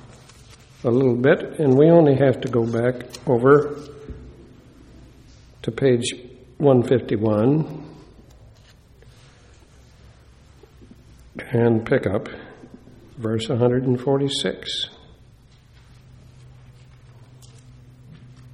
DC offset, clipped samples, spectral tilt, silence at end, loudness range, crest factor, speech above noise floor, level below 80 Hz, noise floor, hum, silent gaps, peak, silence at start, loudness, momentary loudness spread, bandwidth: under 0.1%; under 0.1%; -6.5 dB/octave; 0.3 s; 10 LU; 20 dB; 32 dB; -52 dBFS; -50 dBFS; none; none; -2 dBFS; 0.85 s; -20 LUFS; 22 LU; 11.5 kHz